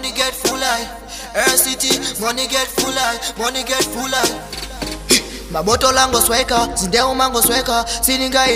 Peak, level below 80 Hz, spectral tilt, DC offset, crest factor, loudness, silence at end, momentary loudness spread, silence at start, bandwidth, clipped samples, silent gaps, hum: 0 dBFS; -36 dBFS; -1.5 dB/octave; under 0.1%; 18 dB; -16 LUFS; 0 s; 11 LU; 0 s; 16 kHz; under 0.1%; none; none